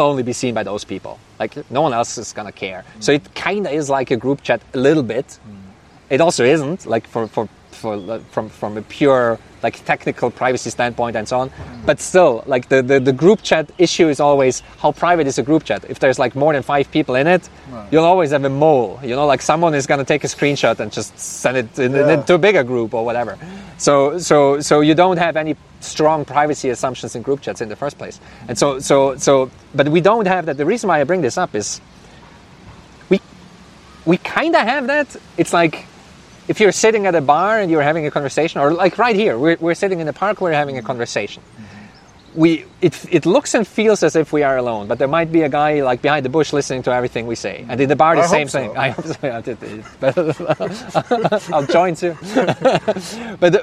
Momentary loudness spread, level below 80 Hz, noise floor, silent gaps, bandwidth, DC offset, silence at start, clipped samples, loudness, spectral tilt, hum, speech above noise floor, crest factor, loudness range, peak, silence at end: 12 LU; -52 dBFS; -43 dBFS; none; 13.5 kHz; under 0.1%; 0 s; under 0.1%; -17 LUFS; -5 dB/octave; none; 27 dB; 16 dB; 5 LU; 0 dBFS; 0 s